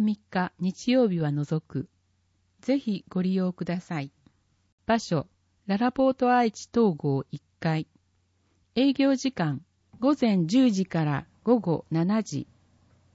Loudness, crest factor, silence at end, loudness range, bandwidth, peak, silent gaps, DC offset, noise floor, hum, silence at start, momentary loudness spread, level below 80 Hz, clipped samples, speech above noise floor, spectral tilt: -26 LUFS; 18 dB; 0.7 s; 5 LU; 8 kHz; -10 dBFS; 4.72-4.78 s; under 0.1%; -69 dBFS; none; 0 s; 14 LU; -64 dBFS; under 0.1%; 44 dB; -7 dB/octave